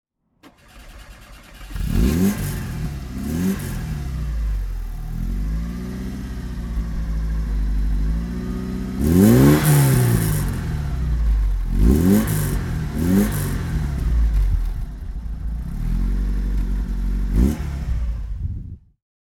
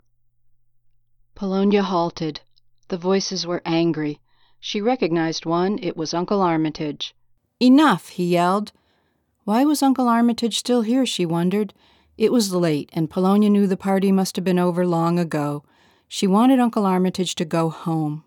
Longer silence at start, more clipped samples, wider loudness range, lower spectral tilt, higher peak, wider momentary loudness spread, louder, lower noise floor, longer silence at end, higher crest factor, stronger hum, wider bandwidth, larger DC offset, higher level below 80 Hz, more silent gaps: second, 0.45 s vs 1.4 s; neither; first, 9 LU vs 4 LU; about the same, -6.5 dB/octave vs -6 dB/octave; first, -2 dBFS vs -6 dBFS; first, 15 LU vs 11 LU; about the same, -22 LUFS vs -20 LUFS; second, -52 dBFS vs -67 dBFS; first, 0.6 s vs 0.05 s; about the same, 20 dB vs 16 dB; neither; about the same, 19 kHz vs 18 kHz; neither; first, -24 dBFS vs -62 dBFS; neither